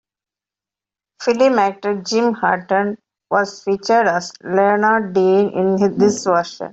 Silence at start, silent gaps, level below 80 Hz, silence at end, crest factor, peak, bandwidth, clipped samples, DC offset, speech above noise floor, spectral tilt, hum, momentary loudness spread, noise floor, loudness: 1.2 s; none; -62 dBFS; 0 s; 16 dB; 0 dBFS; 8 kHz; under 0.1%; under 0.1%; 73 dB; -5 dB/octave; none; 7 LU; -89 dBFS; -17 LUFS